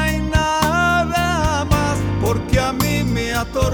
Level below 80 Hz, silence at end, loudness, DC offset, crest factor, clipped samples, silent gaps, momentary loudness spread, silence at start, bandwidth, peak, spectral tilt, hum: -26 dBFS; 0 s; -18 LUFS; under 0.1%; 14 dB; under 0.1%; none; 4 LU; 0 s; over 20 kHz; -4 dBFS; -5 dB/octave; none